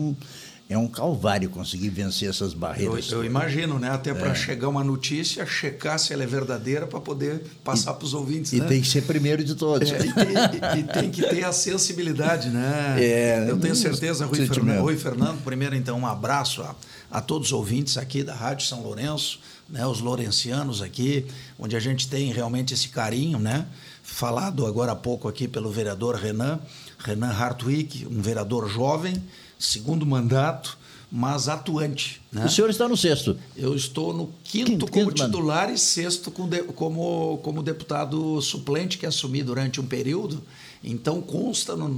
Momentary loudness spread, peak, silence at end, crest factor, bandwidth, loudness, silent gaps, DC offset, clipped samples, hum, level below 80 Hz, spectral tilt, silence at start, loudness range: 9 LU; -6 dBFS; 0 s; 18 dB; 19 kHz; -25 LUFS; none; under 0.1%; under 0.1%; none; -56 dBFS; -4.5 dB/octave; 0 s; 5 LU